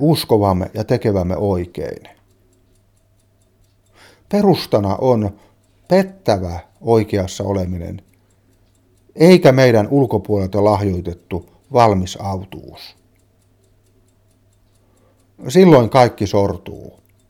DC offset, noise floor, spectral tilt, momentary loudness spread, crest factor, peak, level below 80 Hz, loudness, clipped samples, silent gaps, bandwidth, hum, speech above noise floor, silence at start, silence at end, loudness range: under 0.1%; -56 dBFS; -7 dB/octave; 19 LU; 18 dB; 0 dBFS; -46 dBFS; -16 LUFS; under 0.1%; none; 16.5 kHz; none; 41 dB; 0 s; 0.45 s; 8 LU